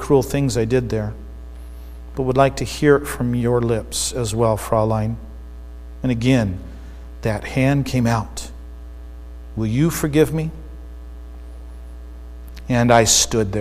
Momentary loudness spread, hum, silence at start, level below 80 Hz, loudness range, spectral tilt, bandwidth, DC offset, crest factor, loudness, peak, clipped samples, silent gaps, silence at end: 22 LU; none; 0 s; -34 dBFS; 4 LU; -5 dB/octave; 15.5 kHz; under 0.1%; 20 dB; -19 LUFS; 0 dBFS; under 0.1%; none; 0 s